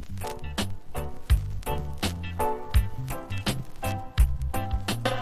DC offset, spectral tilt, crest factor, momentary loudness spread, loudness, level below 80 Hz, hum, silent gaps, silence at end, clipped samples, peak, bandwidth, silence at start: under 0.1%; -5 dB/octave; 18 dB; 9 LU; -30 LUFS; -30 dBFS; none; none; 0 s; under 0.1%; -10 dBFS; 15.5 kHz; 0 s